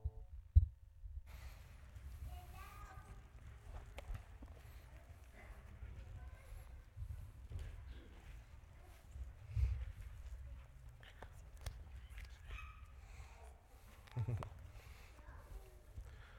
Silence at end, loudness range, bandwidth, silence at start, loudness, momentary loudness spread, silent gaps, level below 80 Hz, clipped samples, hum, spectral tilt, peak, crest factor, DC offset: 0 s; 7 LU; 16.5 kHz; 0 s; -49 LUFS; 16 LU; none; -50 dBFS; under 0.1%; none; -6.5 dB/octave; -16 dBFS; 30 dB; under 0.1%